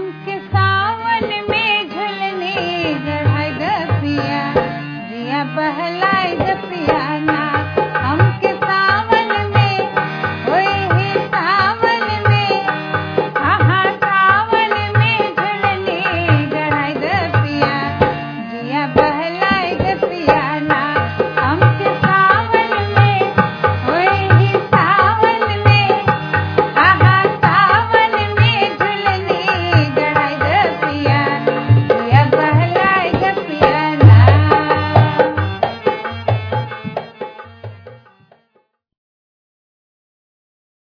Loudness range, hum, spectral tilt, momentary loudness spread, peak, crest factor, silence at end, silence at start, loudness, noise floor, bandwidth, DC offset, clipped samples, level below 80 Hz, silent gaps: 6 LU; none; -8 dB/octave; 8 LU; 0 dBFS; 14 dB; 3 s; 0 s; -15 LUFS; -61 dBFS; 5.4 kHz; under 0.1%; 0.1%; -44 dBFS; none